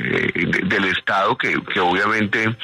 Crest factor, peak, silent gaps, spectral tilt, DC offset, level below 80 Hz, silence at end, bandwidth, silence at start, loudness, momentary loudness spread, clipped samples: 14 dB; -6 dBFS; none; -5.5 dB/octave; under 0.1%; -54 dBFS; 0 s; 13 kHz; 0 s; -18 LUFS; 2 LU; under 0.1%